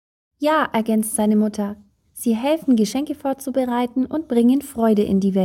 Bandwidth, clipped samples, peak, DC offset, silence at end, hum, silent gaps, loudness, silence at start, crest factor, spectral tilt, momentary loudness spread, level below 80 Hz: 16.5 kHz; under 0.1%; -6 dBFS; under 0.1%; 0 s; none; none; -20 LUFS; 0.4 s; 14 dB; -5.5 dB/octave; 8 LU; -56 dBFS